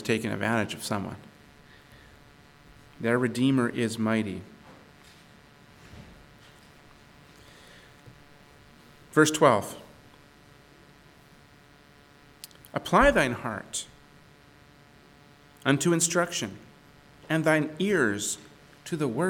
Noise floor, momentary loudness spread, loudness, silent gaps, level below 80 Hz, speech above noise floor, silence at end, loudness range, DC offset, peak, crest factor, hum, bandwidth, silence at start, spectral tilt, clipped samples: -55 dBFS; 24 LU; -26 LUFS; none; -52 dBFS; 30 dB; 0 s; 6 LU; under 0.1%; -6 dBFS; 24 dB; none; 19 kHz; 0 s; -4.5 dB/octave; under 0.1%